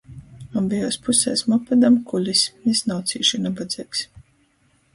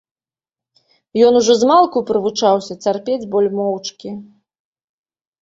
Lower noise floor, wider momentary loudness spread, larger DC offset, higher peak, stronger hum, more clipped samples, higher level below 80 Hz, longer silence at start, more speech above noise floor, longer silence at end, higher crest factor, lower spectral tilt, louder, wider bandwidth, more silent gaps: second, -62 dBFS vs under -90 dBFS; second, 11 LU vs 15 LU; neither; about the same, -4 dBFS vs -2 dBFS; neither; neither; first, -56 dBFS vs -62 dBFS; second, 0.1 s vs 1.15 s; second, 41 dB vs over 75 dB; second, 0.75 s vs 1.2 s; about the same, 18 dB vs 16 dB; about the same, -3.5 dB/octave vs -4.5 dB/octave; second, -20 LUFS vs -15 LUFS; first, 11.5 kHz vs 7.8 kHz; neither